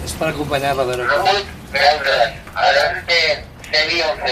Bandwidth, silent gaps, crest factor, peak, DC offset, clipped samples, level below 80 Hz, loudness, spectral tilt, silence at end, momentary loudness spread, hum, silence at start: 15.5 kHz; none; 16 dB; -2 dBFS; under 0.1%; under 0.1%; -40 dBFS; -17 LUFS; -3 dB/octave; 0 s; 6 LU; none; 0 s